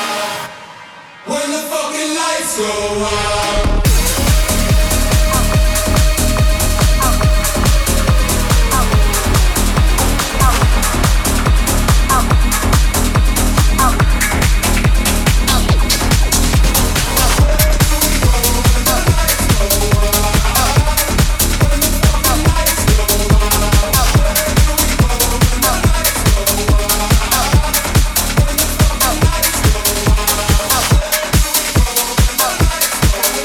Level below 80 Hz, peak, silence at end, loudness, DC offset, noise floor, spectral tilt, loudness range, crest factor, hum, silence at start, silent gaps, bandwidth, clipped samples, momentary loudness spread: -16 dBFS; 0 dBFS; 0 s; -13 LUFS; under 0.1%; -35 dBFS; -3.5 dB/octave; 1 LU; 12 dB; none; 0 s; none; 19.5 kHz; under 0.1%; 3 LU